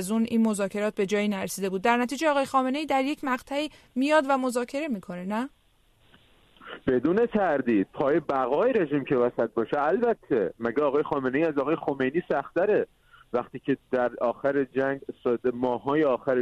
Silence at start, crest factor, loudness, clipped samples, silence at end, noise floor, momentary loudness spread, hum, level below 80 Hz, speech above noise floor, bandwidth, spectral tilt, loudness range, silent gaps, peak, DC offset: 0 s; 18 dB; -26 LUFS; under 0.1%; 0 s; -63 dBFS; 8 LU; none; -62 dBFS; 37 dB; 13.5 kHz; -5.5 dB/octave; 3 LU; none; -8 dBFS; under 0.1%